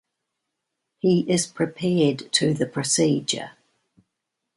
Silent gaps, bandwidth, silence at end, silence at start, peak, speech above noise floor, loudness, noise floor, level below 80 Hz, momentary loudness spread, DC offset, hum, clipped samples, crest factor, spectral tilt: none; 11.5 kHz; 1.05 s; 1.05 s; -6 dBFS; 59 dB; -22 LUFS; -81 dBFS; -64 dBFS; 7 LU; under 0.1%; none; under 0.1%; 20 dB; -4.5 dB/octave